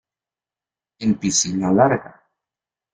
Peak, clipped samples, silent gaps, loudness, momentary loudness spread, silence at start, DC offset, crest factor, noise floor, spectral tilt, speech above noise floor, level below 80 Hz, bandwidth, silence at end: -2 dBFS; under 0.1%; none; -19 LUFS; 8 LU; 1 s; under 0.1%; 20 dB; under -90 dBFS; -4 dB/octave; over 72 dB; -58 dBFS; 9.6 kHz; 0.85 s